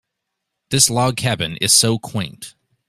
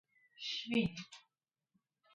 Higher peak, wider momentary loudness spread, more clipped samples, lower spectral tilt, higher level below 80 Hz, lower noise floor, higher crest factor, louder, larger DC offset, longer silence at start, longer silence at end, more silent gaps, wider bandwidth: first, 0 dBFS vs -22 dBFS; second, 14 LU vs 19 LU; neither; second, -2.5 dB/octave vs -5 dB/octave; first, -52 dBFS vs -70 dBFS; second, -78 dBFS vs -89 dBFS; about the same, 20 dB vs 22 dB; first, -16 LUFS vs -38 LUFS; neither; first, 0.7 s vs 0.4 s; second, 0.4 s vs 0.95 s; neither; first, 16 kHz vs 9 kHz